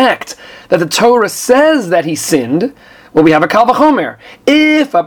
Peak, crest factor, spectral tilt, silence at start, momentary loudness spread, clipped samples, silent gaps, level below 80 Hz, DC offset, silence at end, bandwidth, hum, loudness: 0 dBFS; 10 dB; -4 dB/octave; 0 s; 10 LU; 0.4%; none; -50 dBFS; under 0.1%; 0 s; 19.5 kHz; none; -11 LUFS